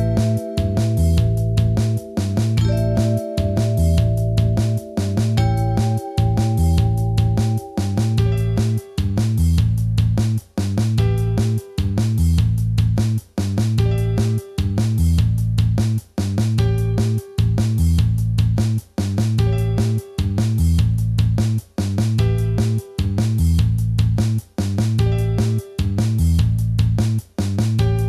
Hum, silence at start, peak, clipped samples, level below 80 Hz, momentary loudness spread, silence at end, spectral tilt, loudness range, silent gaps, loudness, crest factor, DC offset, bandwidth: none; 0 s; -6 dBFS; under 0.1%; -28 dBFS; 5 LU; 0 s; -7.5 dB/octave; 1 LU; none; -19 LUFS; 12 dB; under 0.1%; 13.5 kHz